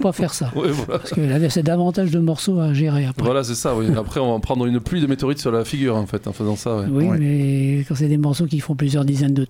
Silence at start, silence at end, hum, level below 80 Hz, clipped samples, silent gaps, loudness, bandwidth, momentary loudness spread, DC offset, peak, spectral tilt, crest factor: 0 s; 0 s; none; -42 dBFS; under 0.1%; none; -20 LUFS; 16 kHz; 4 LU; under 0.1%; -4 dBFS; -6.5 dB/octave; 14 dB